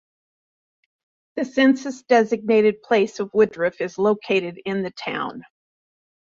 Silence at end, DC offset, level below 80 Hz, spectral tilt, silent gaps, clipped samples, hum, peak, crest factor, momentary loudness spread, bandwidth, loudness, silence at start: 0.9 s; under 0.1%; -66 dBFS; -5.5 dB/octave; none; under 0.1%; none; -4 dBFS; 18 dB; 9 LU; 7.6 kHz; -21 LUFS; 1.35 s